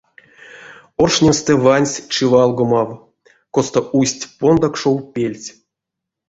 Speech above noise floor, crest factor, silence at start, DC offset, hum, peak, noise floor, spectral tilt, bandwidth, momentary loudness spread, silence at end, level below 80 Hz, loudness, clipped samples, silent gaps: 67 dB; 16 dB; 0.55 s; under 0.1%; none; -2 dBFS; -82 dBFS; -5 dB/octave; 8 kHz; 10 LU; 0.8 s; -46 dBFS; -16 LUFS; under 0.1%; none